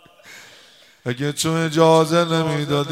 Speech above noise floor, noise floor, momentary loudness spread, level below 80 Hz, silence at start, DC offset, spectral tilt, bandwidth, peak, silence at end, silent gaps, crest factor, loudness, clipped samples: 32 dB; -50 dBFS; 11 LU; -60 dBFS; 0.25 s; under 0.1%; -5 dB/octave; 16 kHz; -2 dBFS; 0 s; none; 18 dB; -18 LUFS; under 0.1%